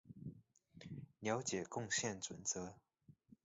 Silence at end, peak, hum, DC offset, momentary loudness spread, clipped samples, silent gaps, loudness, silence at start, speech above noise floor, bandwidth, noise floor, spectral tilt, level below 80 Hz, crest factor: 0.1 s; -26 dBFS; none; under 0.1%; 15 LU; under 0.1%; none; -43 LUFS; 0.05 s; 24 dB; 7.6 kHz; -67 dBFS; -3.5 dB/octave; -74 dBFS; 20 dB